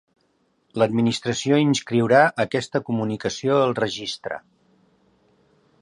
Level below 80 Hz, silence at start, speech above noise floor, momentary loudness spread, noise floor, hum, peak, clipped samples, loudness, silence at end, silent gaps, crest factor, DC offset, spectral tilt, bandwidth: -62 dBFS; 0.75 s; 45 dB; 13 LU; -66 dBFS; none; -2 dBFS; under 0.1%; -21 LUFS; 1.45 s; none; 20 dB; under 0.1%; -5 dB/octave; 11 kHz